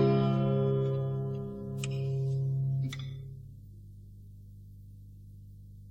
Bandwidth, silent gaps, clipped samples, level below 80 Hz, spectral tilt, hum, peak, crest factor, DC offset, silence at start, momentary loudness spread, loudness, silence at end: 8.4 kHz; none; under 0.1%; -54 dBFS; -8 dB/octave; 50 Hz at -50 dBFS; -16 dBFS; 16 dB; under 0.1%; 0 s; 23 LU; -32 LUFS; 0 s